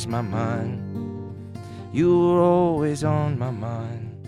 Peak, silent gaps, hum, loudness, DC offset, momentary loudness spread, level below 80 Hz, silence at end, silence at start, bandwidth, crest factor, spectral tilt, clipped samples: -6 dBFS; none; none; -23 LUFS; under 0.1%; 18 LU; -52 dBFS; 0 s; 0 s; 11 kHz; 16 dB; -8 dB/octave; under 0.1%